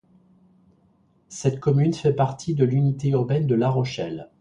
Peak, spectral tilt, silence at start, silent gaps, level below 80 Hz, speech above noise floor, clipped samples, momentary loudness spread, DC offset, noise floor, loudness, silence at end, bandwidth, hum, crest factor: -6 dBFS; -7.5 dB/octave; 1.3 s; none; -56 dBFS; 40 dB; under 0.1%; 7 LU; under 0.1%; -61 dBFS; -23 LUFS; 0.15 s; 9.4 kHz; none; 16 dB